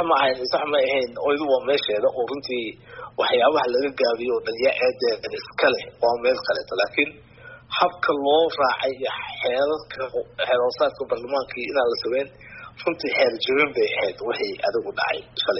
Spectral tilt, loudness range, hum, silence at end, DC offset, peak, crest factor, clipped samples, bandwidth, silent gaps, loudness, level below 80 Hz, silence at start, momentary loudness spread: -0.5 dB/octave; 2 LU; none; 0 s; under 0.1%; -6 dBFS; 18 dB; under 0.1%; 6 kHz; none; -23 LUFS; -60 dBFS; 0 s; 9 LU